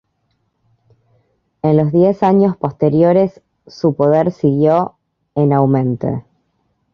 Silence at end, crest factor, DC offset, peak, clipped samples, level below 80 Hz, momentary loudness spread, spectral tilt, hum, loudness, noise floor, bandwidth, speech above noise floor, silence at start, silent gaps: 0.7 s; 14 dB; under 0.1%; -2 dBFS; under 0.1%; -54 dBFS; 9 LU; -10.5 dB/octave; none; -15 LUFS; -66 dBFS; 6.6 kHz; 52 dB; 1.65 s; none